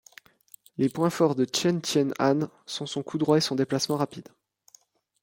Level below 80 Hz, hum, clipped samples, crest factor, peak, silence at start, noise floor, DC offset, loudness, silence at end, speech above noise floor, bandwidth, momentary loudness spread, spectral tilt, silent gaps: -68 dBFS; none; under 0.1%; 20 dB; -8 dBFS; 0.8 s; -60 dBFS; under 0.1%; -26 LUFS; 1 s; 35 dB; 16.5 kHz; 9 LU; -5 dB/octave; none